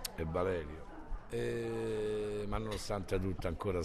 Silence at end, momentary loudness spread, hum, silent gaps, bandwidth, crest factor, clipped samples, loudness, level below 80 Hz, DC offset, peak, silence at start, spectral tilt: 0 s; 10 LU; none; none; 13.5 kHz; 18 dB; under 0.1%; -38 LUFS; -46 dBFS; under 0.1%; -20 dBFS; 0 s; -6 dB/octave